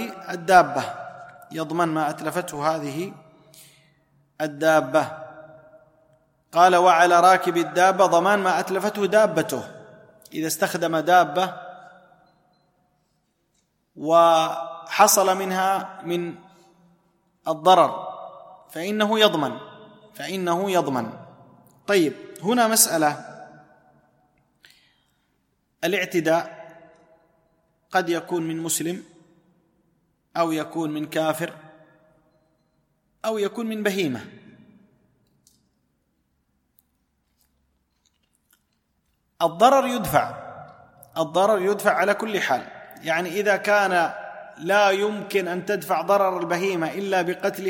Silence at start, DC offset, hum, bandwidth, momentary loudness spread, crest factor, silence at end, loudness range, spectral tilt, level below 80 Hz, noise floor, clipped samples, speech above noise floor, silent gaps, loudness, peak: 0 s; under 0.1%; none; 16.5 kHz; 18 LU; 22 dB; 0 s; 10 LU; -3.5 dB/octave; -64 dBFS; -71 dBFS; under 0.1%; 50 dB; none; -21 LUFS; -2 dBFS